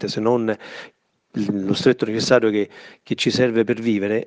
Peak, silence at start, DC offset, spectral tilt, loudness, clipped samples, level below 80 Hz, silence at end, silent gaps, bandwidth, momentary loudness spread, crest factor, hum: 0 dBFS; 0 s; under 0.1%; -5.5 dB/octave; -20 LUFS; under 0.1%; -62 dBFS; 0 s; none; 9.8 kHz; 13 LU; 20 dB; none